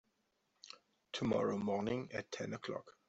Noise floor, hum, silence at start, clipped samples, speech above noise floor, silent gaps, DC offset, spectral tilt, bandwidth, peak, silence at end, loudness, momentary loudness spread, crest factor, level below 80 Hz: -81 dBFS; none; 0.65 s; under 0.1%; 42 dB; none; under 0.1%; -5.5 dB/octave; 8.2 kHz; -22 dBFS; 0.2 s; -40 LUFS; 20 LU; 18 dB; -72 dBFS